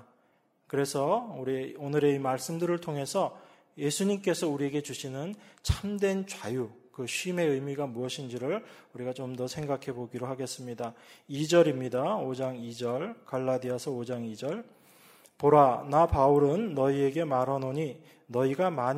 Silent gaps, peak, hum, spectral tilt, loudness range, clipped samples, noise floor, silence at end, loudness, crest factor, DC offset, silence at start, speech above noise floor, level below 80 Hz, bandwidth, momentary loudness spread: none; -8 dBFS; none; -5.5 dB/octave; 8 LU; under 0.1%; -69 dBFS; 0 s; -30 LUFS; 20 dB; under 0.1%; 0.75 s; 40 dB; -52 dBFS; 16 kHz; 13 LU